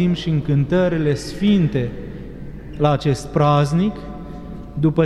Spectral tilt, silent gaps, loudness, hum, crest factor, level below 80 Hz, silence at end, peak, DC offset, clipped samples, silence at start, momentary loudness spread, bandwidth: -7.5 dB/octave; none; -19 LUFS; none; 16 dB; -38 dBFS; 0 s; -4 dBFS; under 0.1%; under 0.1%; 0 s; 17 LU; 12 kHz